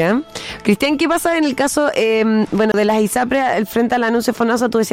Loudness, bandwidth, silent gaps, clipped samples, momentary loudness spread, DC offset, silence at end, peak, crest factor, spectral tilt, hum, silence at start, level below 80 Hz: -16 LUFS; 16.5 kHz; none; under 0.1%; 2 LU; under 0.1%; 0 s; -2 dBFS; 14 dB; -4.5 dB/octave; none; 0 s; -50 dBFS